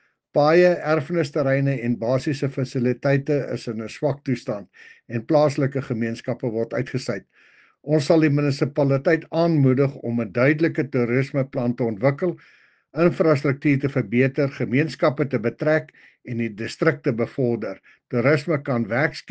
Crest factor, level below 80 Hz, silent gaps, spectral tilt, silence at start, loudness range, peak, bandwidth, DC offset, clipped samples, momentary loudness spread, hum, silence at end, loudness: 18 dB; -62 dBFS; none; -7.5 dB/octave; 0.35 s; 4 LU; -4 dBFS; 9 kHz; under 0.1%; under 0.1%; 10 LU; none; 0 s; -22 LUFS